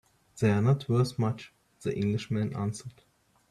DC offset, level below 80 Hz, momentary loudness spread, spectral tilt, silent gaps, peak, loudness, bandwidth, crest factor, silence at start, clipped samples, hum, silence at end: under 0.1%; -62 dBFS; 15 LU; -7.5 dB/octave; none; -12 dBFS; -29 LUFS; 12 kHz; 18 dB; 0.35 s; under 0.1%; none; 0.6 s